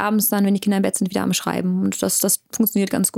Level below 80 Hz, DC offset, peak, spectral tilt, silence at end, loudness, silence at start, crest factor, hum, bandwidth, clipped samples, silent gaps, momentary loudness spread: -62 dBFS; under 0.1%; -6 dBFS; -4.5 dB/octave; 0 s; -19 LUFS; 0 s; 14 dB; none; 17.5 kHz; under 0.1%; none; 4 LU